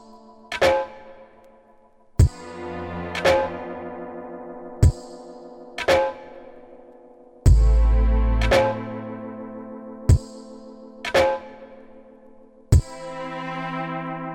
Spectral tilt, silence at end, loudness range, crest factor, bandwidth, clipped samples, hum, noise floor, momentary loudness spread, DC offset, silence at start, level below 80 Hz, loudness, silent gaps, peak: -6 dB/octave; 0 s; 4 LU; 22 dB; 12.5 kHz; under 0.1%; none; -54 dBFS; 22 LU; under 0.1%; 0.15 s; -26 dBFS; -23 LUFS; none; -2 dBFS